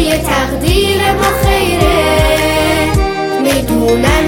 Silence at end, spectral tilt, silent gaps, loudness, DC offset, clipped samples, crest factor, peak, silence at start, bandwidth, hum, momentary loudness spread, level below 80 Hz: 0 s; -4.5 dB/octave; none; -12 LUFS; under 0.1%; under 0.1%; 12 dB; 0 dBFS; 0 s; 17 kHz; none; 3 LU; -20 dBFS